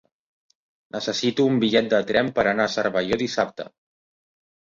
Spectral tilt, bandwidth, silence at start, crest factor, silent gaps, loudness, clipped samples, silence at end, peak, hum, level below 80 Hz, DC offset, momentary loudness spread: -5 dB/octave; 7.6 kHz; 0.95 s; 20 dB; none; -22 LUFS; under 0.1%; 1 s; -4 dBFS; none; -58 dBFS; under 0.1%; 10 LU